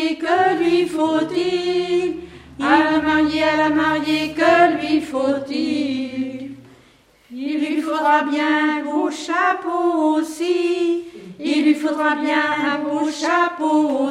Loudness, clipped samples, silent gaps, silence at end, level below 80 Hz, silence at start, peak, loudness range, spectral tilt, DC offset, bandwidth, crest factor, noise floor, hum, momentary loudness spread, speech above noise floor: -19 LUFS; under 0.1%; none; 0 s; -54 dBFS; 0 s; -2 dBFS; 4 LU; -4.5 dB/octave; under 0.1%; 12 kHz; 18 dB; -53 dBFS; none; 9 LU; 35 dB